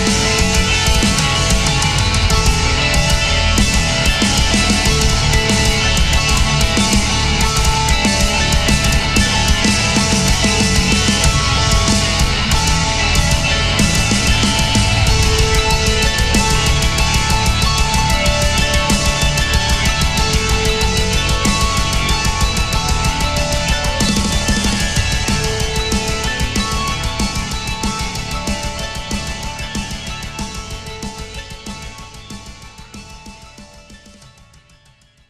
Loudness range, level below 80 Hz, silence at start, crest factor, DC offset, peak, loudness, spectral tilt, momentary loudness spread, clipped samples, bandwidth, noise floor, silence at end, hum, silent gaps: 11 LU; -20 dBFS; 0 s; 14 dB; under 0.1%; 0 dBFS; -14 LUFS; -3.5 dB/octave; 11 LU; under 0.1%; 15.5 kHz; -50 dBFS; 1.35 s; none; none